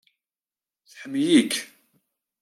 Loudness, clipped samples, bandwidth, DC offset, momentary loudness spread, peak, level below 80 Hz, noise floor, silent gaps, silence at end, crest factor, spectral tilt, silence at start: -22 LUFS; under 0.1%; 14.5 kHz; under 0.1%; 23 LU; -6 dBFS; -78 dBFS; under -90 dBFS; none; 0.75 s; 20 dB; -3.5 dB/octave; 0.95 s